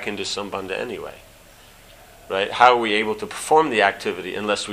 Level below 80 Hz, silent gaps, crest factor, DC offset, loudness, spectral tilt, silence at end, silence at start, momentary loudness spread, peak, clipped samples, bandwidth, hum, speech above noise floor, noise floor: -54 dBFS; none; 22 dB; under 0.1%; -20 LUFS; -3 dB/octave; 0 s; 0 s; 13 LU; 0 dBFS; under 0.1%; 15.5 kHz; none; 27 dB; -48 dBFS